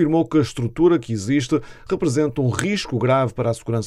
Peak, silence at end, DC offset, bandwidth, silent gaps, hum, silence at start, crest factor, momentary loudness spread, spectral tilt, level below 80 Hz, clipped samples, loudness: 0 dBFS; 0 s; under 0.1%; 12.5 kHz; none; none; 0 s; 18 dB; 6 LU; -6.5 dB/octave; -48 dBFS; under 0.1%; -20 LUFS